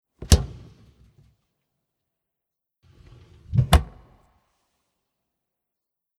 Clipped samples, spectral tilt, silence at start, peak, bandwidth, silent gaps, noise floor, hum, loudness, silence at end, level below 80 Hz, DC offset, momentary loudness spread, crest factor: under 0.1%; -5 dB/octave; 0.2 s; 0 dBFS; 15 kHz; none; -85 dBFS; none; -22 LUFS; 2.35 s; -32 dBFS; under 0.1%; 16 LU; 28 dB